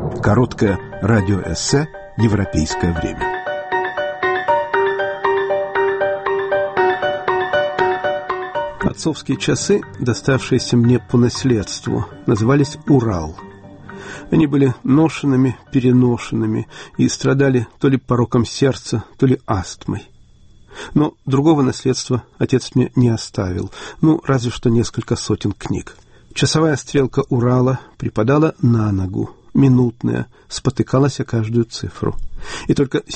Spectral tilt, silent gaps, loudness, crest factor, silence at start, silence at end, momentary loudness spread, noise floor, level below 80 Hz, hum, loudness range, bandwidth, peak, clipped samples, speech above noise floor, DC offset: -6 dB/octave; none; -18 LUFS; 14 dB; 0 s; 0 s; 9 LU; -45 dBFS; -40 dBFS; none; 3 LU; 8.8 kHz; -2 dBFS; under 0.1%; 29 dB; under 0.1%